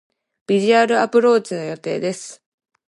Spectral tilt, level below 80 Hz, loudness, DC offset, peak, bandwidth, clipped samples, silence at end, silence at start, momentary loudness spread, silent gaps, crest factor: -5 dB/octave; -72 dBFS; -18 LUFS; under 0.1%; -2 dBFS; 11.5 kHz; under 0.1%; 0.55 s; 0.5 s; 12 LU; none; 16 dB